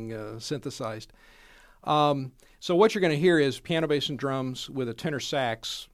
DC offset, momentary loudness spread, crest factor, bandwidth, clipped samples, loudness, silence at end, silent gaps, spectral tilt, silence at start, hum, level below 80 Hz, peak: under 0.1%; 14 LU; 20 dB; 15.5 kHz; under 0.1%; -27 LUFS; 0.1 s; none; -5 dB/octave; 0 s; none; -60 dBFS; -8 dBFS